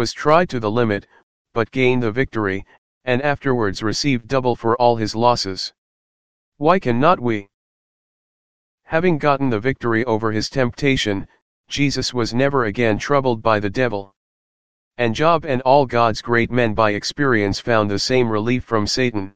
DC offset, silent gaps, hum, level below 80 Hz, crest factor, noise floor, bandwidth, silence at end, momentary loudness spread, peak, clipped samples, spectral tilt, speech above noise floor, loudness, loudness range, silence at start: 2%; 1.23-1.45 s, 2.78-3.01 s, 5.78-6.52 s, 7.54-8.78 s, 11.42-11.64 s, 14.16-14.91 s; none; -44 dBFS; 18 dB; under -90 dBFS; 9.6 kHz; 0 s; 7 LU; 0 dBFS; under 0.1%; -5.5 dB/octave; over 72 dB; -19 LUFS; 4 LU; 0 s